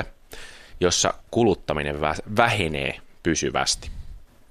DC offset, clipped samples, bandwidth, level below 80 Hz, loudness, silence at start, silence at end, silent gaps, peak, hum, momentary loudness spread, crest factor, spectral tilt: under 0.1%; under 0.1%; 14.5 kHz; -42 dBFS; -23 LUFS; 0 s; 0.25 s; none; -2 dBFS; none; 21 LU; 24 dB; -3.5 dB/octave